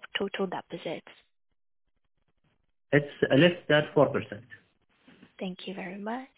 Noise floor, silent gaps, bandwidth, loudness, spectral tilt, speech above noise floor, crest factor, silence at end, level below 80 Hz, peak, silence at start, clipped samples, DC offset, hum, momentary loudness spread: -72 dBFS; none; 4 kHz; -28 LUFS; -10 dB/octave; 45 dB; 22 dB; 0.1 s; -66 dBFS; -8 dBFS; 0.05 s; under 0.1%; under 0.1%; none; 17 LU